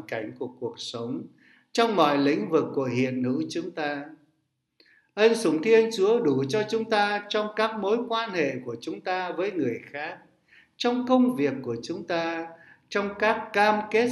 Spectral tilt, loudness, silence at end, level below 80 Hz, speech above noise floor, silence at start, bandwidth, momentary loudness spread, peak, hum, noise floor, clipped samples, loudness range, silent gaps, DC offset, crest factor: -5 dB/octave; -26 LUFS; 0 s; -72 dBFS; 50 dB; 0 s; 12 kHz; 13 LU; -6 dBFS; none; -75 dBFS; under 0.1%; 4 LU; none; under 0.1%; 20 dB